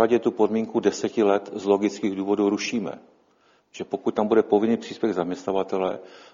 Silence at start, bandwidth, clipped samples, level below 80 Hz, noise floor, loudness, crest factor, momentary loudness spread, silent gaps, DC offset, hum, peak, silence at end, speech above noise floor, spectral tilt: 0 s; 7.6 kHz; under 0.1%; -66 dBFS; -62 dBFS; -24 LUFS; 18 dB; 8 LU; none; under 0.1%; none; -6 dBFS; 0.1 s; 39 dB; -5.5 dB/octave